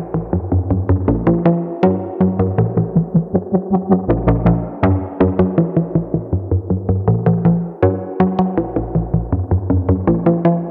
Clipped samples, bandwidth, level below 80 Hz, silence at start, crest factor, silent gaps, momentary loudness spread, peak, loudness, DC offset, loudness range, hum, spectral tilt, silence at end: under 0.1%; 3.9 kHz; -32 dBFS; 0 s; 16 dB; none; 5 LU; 0 dBFS; -17 LUFS; under 0.1%; 1 LU; none; -12.5 dB/octave; 0 s